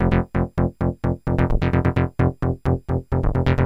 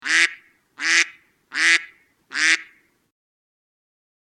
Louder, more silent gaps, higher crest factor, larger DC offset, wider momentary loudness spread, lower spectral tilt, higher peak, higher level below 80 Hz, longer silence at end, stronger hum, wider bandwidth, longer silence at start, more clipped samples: second, -22 LUFS vs -19 LUFS; neither; second, 14 dB vs 24 dB; neither; second, 4 LU vs 9 LU; first, -9.5 dB/octave vs 3 dB/octave; second, -6 dBFS vs 0 dBFS; first, -28 dBFS vs -82 dBFS; second, 0 s vs 1.7 s; neither; second, 6 kHz vs 13 kHz; about the same, 0 s vs 0.05 s; neither